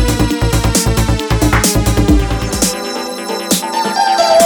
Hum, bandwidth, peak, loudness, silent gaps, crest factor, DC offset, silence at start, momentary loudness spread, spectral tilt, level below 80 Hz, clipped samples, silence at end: none; over 20 kHz; 0 dBFS; -14 LUFS; none; 12 dB; under 0.1%; 0 s; 8 LU; -4.5 dB/octave; -20 dBFS; under 0.1%; 0 s